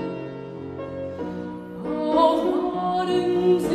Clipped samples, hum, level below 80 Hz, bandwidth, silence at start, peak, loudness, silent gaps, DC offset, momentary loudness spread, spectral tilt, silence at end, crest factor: under 0.1%; none; -54 dBFS; 13 kHz; 0 s; -6 dBFS; -24 LUFS; none; under 0.1%; 15 LU; -7 dB/octave; 0 s; 18 dB